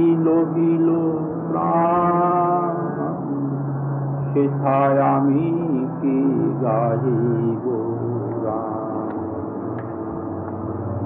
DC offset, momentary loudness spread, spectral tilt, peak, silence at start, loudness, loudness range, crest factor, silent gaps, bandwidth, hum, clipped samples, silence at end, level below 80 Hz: under 0.1%; 10 LU; -10 dB/octave; -8 dBFS; 0 s; -21 LUFS; 5 LU; 12 dB; none; 3.4 kHz; none; under 0.1%; 0 s; -58 dBFS